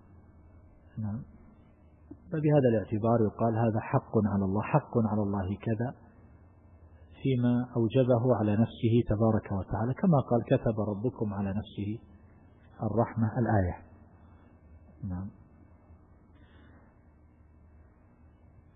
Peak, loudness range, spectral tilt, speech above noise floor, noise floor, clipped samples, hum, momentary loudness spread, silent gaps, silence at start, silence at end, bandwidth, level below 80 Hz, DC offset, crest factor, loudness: -10 dBFS; 14 LU; -12.5 dB/octave; 31 dB; -59 dBFS; under 0.1%; none; 12 LU; none; 0.95 s; 2.8 s; 3.9 kHz; -54 dBFS; under 0.1%; 20 dB; -29 LUFS